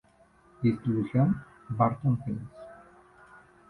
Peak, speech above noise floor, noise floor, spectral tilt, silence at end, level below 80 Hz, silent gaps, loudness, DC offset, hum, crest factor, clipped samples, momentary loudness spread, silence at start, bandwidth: -10 dBFS; 34 dB; -61 dBFS; -10.5 dB/octave; 0.95 s; -58 dBFS; none; -29 LUFS; under 0.1%; none; 20 dB; under 0.1%; 18 LU; 0.6 s; 4.4 kHz